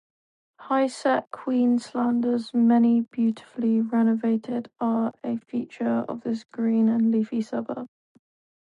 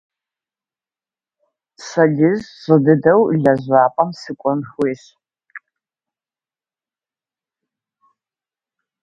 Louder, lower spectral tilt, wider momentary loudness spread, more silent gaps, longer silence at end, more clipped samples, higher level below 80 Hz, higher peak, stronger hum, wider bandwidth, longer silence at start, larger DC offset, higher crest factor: second, -24 LUFS vs -16 LUFS; about the same, -7 dB/octave vs -8 dB/octave; about the same, 10 LU vs 11 LU; neither; second, 0.8 s vs 3.45 s; neither; second, -76 dBFS vs -60 dBFS; second, -10 dBFS vs 0 dBFS; neither; first, 10 kHz vs 7.8 kHz; second, 0.6 s vs 1.8 s; neither; second, 14 dB vs 20 dB